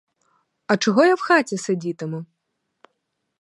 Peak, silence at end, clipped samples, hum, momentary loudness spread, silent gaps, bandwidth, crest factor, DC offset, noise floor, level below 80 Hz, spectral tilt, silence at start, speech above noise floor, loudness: -4 dBFS; 1.15 s; under 0.1%; none; 15 LU; none; 11.5 kHz; 20 dB; under 0.1%; -76 dBFS; -76 dBFS; -5 dB/octave; 0.7 s; 57 dB; -20 LUFS